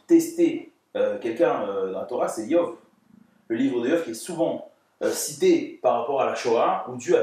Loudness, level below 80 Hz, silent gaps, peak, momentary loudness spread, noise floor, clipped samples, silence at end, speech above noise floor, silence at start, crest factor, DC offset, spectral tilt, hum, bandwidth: -24 LUFS; -80 dBFS; none; -8 dBFS; 8 LU; -57 dBFS; under 0.1%; 0 s; 33 dB; 0.1 s; 16 dB; under 0.1%; -4.5 dB/octave; none; 15.5 kHz